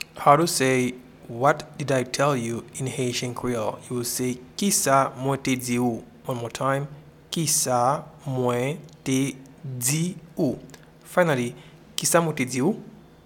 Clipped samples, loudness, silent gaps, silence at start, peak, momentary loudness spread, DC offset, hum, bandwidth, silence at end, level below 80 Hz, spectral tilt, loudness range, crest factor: under 0.1%; -24 LUFS; none; 0 s; 0 dBFS; 12 LU; under 0.1%; none; 19 kHz; 0.3 s; -58 dBFS; -4 dB/octave; 2 LU; 24 dB